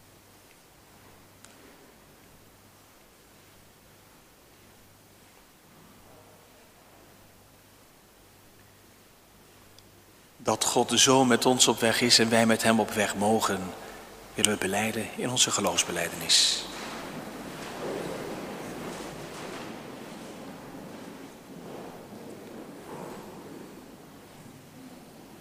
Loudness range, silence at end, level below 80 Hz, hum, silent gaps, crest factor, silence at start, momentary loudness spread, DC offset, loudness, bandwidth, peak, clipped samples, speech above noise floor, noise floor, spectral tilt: 21 LU; 0 s; -62 dBFS; none; none; 30 dB; 1.65 s; 25 LU; under 0.1%; -25 LUFS; 16 kHz; 0 dBFS; under 0.1%; 31 dB; -56 dBFS; -2.5 dB/octave